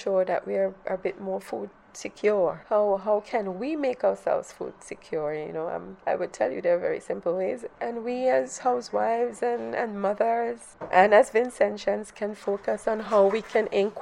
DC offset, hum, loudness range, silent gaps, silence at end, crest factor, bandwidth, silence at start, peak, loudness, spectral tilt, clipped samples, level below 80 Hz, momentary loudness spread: under 0.1%; none; 5 LU; none; 0 s; 24 dB; 12 kHz; 0 s; -2 dBFS; -26 LUFS; -5 dB/octave; under 0.1%; -64 dBFS; 11 LU